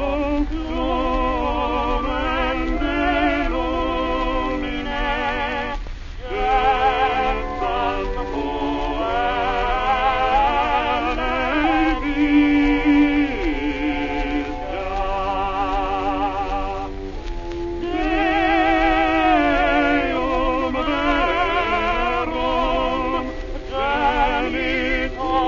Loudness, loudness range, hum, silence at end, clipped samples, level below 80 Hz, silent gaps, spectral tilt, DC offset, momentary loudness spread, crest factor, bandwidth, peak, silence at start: -21 LUFS; 5 LU; none; 0 s; under 0.1%; -30 dBFS; none; -6 dB/octave; 0.5%; 9 LU; 16 dB; 7.2 kHz; -4 dBFS; 0 s